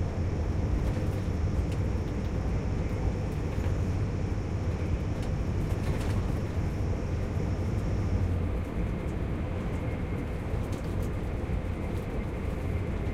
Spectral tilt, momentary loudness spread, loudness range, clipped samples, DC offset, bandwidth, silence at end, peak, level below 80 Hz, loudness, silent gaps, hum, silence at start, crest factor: -8 dB/octave; 3 LU; 2 LU; under 0.1%; under 0.1%; 13 kHz; 0 s; -16 dBFS; -34 dBFS; -32 LUFS; none; none; 0 s; 14 dB